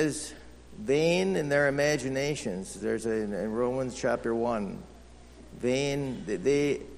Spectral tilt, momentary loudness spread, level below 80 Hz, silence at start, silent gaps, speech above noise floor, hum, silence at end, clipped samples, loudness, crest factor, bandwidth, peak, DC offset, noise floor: -5 dB/octave; 10 LU; -54 dBFS; 0 s; none; 21 dB; none; 0 s; under 0.1%; -29 LUFS; 16 dB; 13 kHz; -12 dBFS; under 0.1%; -50 dBFS